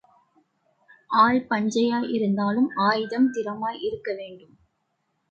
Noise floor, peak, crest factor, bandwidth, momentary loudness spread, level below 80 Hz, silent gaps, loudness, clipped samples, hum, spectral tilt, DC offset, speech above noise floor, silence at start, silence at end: -74 dBFS; -6 dBFS; 18 dB; 8 kHz; 12 LU; -66 dBFS; none; -24 LUFS; under 0.1%; none; -5.5 dB/octave; under 0.1%; 51 dB; 1.1 s; 0.9 s